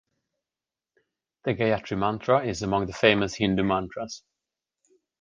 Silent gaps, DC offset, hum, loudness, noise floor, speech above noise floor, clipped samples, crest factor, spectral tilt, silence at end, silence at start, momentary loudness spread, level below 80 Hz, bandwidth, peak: none; under 0.1%; none; -25 LUFS; under -90 dBFS; over 65 dB; under 0.1%; 24 dB; -5.5 dB/octave; 1.05 s; 1.45 s; 13 LU; -52 dBFS; 9.8 kHz; -4 dBFS